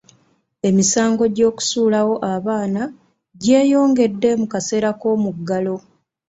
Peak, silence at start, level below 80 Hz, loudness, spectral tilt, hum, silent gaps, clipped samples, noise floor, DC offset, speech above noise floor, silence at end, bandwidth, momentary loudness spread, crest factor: -2 dBFS; 0.65 s; -58 dBFS; -18 LUFS; -4.5 dB/octave; none; none; under 0.1%; -59 dBFS; under 0.1%; 42 dB; 0.5 s; 8 kHz; 9 LU; 16 dB